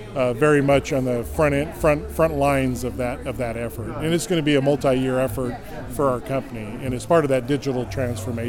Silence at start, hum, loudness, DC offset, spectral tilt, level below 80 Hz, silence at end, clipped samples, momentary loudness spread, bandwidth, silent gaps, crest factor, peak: 0 s; none; -22 LUFS; under 0.1%; -6 dB/octave; -38 dBFS; 0 s; under 0.1%; 10 LU; 17.5 kHz; none; 16 dB; -6 dBFS